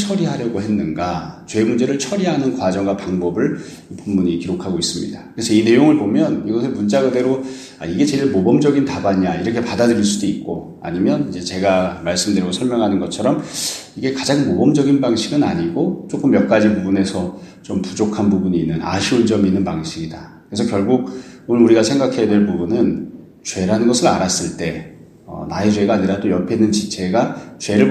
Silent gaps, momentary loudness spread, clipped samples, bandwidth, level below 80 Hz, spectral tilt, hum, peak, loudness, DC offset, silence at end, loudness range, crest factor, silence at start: none; 12 LU; under 0.1%; 13.5 kHz; -50 dBFS; -5.5 dB/octave; none; 0 dBFS; -17 LUFS; under 0.1%; 0 s; 3 LU; 16 dB; 0 s